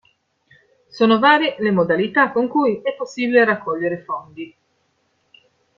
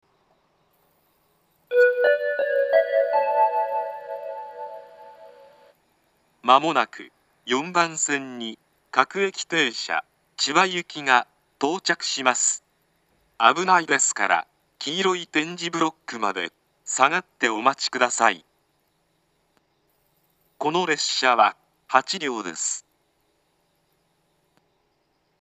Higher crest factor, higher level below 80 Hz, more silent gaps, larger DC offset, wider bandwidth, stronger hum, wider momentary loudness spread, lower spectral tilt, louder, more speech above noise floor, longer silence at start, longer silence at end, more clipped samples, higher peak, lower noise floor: second, 18 dB vs 24 dB; first, -64 dBFS vs -80 dBFS; neither; neither; second, 7.4 kHz vs 14.5 kHz; neither; about the same, 15 LU vs 15 LU; first, -6 dB/octave vs -1.5 dB/octave; first, -18 LUFS vs -22 LUFS; about the same, 48 dB vs 47 dB; second, 0.95 s vs 1.7 s; second, 1.3 s vs 2.6 s; neither; about the same, -2 dBFS vs 0 dBFS; about the same, -66 dBFS vs -69 dBFS